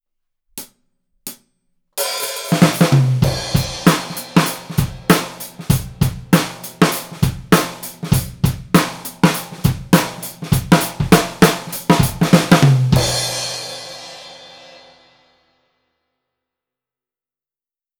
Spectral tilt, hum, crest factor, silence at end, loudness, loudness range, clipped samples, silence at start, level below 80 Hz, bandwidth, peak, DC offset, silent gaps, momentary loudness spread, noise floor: -5 dB/octave; none; 18 dB; 3.55 s; -16 LUFS; 5 LU; under 0.1%; 0.55 s; -36 dBFS; over 20 kHz; 0 dBFS; under 0.1%; none; 18 LU; under -90 dBFS